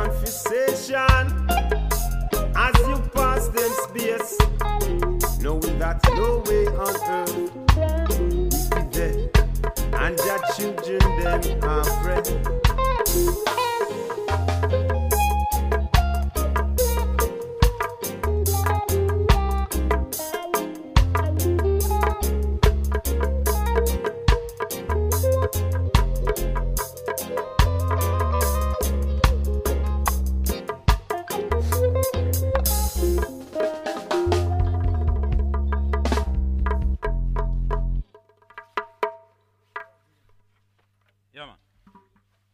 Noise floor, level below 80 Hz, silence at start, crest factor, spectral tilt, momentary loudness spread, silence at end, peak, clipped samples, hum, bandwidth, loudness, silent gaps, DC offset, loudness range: -67 dBFS; -24 dBFS; 0 s; 22 dB; -5 dB/octave; 7 LU; 1.05 s; 0 dBFS; under 0.1%; none; 16.5 kHz; -23 LUFS; none; under 0.1%; 3 LU